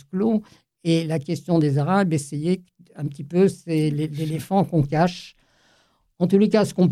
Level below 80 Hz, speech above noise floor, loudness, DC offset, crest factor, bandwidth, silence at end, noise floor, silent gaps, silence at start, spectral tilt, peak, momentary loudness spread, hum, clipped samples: -56 dBFS; 42 dB; -22 LUFS; under 0.1%; 16 dB; 14 kHz; 0 s; -62 dBFS; none; 0.15 s; -7.5 dB/octave; -6 dBFS; 9 LU; none; under 0.1%